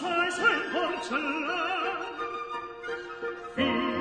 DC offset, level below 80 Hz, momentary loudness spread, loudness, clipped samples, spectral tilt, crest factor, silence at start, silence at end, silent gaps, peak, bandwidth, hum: under 0.1%; -62 dBFS; 12 LU; -29 LUFS; under 0.1%; -3.5 dB/octave; 18 dB; 0 s; 0 s; none; -10 dBFS; 10 kHz; none